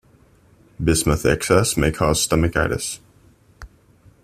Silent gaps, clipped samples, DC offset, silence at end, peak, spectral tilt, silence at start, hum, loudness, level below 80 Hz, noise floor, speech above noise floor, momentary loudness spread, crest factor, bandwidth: none; under 0.1%; under 0.1%; 0.6 s; 0 dBFS; -4.5 dB/octave; 0.8 s; none; -19 LUFS; -36 dBFS; -54 dBFS; 35 dB; 8 LU; 20 dB; 16 kHz